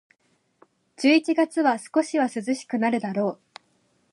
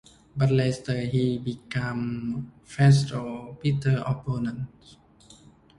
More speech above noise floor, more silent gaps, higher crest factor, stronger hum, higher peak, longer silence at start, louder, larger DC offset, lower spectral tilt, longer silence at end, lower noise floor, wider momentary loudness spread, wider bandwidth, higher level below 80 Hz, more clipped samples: first, 46 dB vs 28 dB; neither; about the same, 18 dB vs 18 dB; neither; about the same, -8 dBFS vs -8 dBFS; first, 1 s vs 0.35 s; first, -23 LUFS vs -26 LUFS; neither; second, -4.5 dB/octave vs -7 dB/octave; second, 0.8 s vs 1.1 s; first, -68 dBFS vs -53 dBFS; second, 8 LU vs 15 LU; about the same, 11.5 kHz vs 11 kHz; second, -80 dBFS vs -54 dBFS; neither